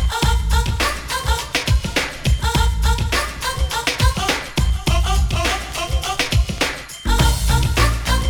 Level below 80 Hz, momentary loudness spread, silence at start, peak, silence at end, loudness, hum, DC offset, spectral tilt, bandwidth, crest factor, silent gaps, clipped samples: -20 dBFS; 4 LU; 0 s; -2 dBFS; 0 s; -19 LUFS; none; under 0.1%; -4 dB/octave; over 20 kHz; 16 dB; none; under 0.1%